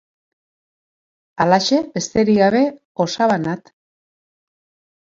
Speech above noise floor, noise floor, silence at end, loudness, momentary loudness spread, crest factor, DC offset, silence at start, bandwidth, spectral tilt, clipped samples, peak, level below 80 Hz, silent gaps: over 73 dB; under -90 dBFS; 1.5 s; -17 LUFS; 9 LU; 20 dB; under 0.1%; 1.4 s; 7.8 kHz; -5 dB/octave; under 0.1%; 0 dBFS; -56 dBFS; 2.85-2.95 s